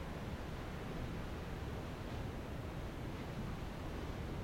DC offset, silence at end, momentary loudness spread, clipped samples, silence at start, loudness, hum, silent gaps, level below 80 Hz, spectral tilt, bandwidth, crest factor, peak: under 0.1%; 0 s; 1 LU; under 0.1%; 0 s; -45 LUFS; none; none; -50 dBFS; -6.5 dB/octave; 16.5 kHz; 14 dB; -30 dBFS